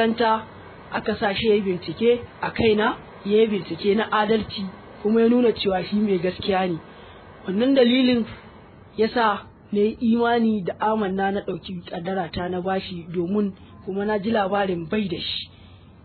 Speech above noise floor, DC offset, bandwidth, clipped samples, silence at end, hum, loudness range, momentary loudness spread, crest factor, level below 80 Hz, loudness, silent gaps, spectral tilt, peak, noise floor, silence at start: 25 dB; under 0.1%; 4.5 kHz; under 0.1%; 0.3 s; none; 4 LU; 12 LU; 16 dB; -52 dBFS; -23 LUFS; none; -9.5 dB/octave; -6 dBFS; -47 dBFS; 0 s